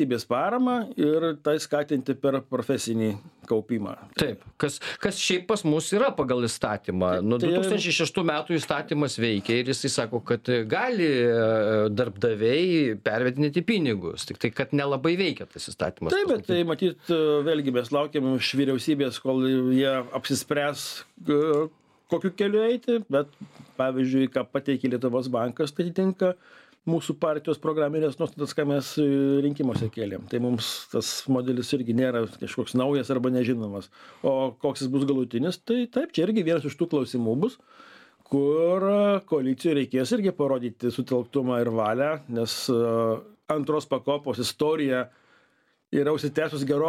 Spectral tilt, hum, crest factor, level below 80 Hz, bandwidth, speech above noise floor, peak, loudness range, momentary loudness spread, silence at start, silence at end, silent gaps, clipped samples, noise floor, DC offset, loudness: -5.5 dB/octave; none; 20 dB; -64 dBFS; 15.5 kHz; 42 dB; -6 dBFS; 3 LU; 6 LU; 0 s; 0 s; none; under 0.1%; -67 dBFS; under 0.1%; -26 LUFS